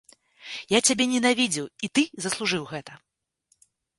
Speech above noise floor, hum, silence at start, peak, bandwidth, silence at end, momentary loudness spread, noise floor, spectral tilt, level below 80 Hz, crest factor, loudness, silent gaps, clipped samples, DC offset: 46 dB; none; 0.4 s; -6 dBFS; 11.5 kHz; 1.05 s; 16 LU; -70 dBFS; -2.5 dB/octave; -68 dBFS; 22 dB; -24 LUFS; none; under 0.1%; under 0.1%